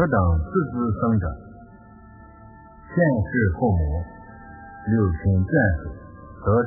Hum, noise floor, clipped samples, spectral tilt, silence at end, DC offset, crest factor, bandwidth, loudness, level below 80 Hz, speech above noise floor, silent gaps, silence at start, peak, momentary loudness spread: none; -46 dBFS; under 0.1%; -15.5 dB/octave; 0 s; under 0.1%; 16 dB; 2.1 kHz; -23 LUFS; -32 dBFS; 25 dB; none; 0 s; -6 dBFS; 21 LU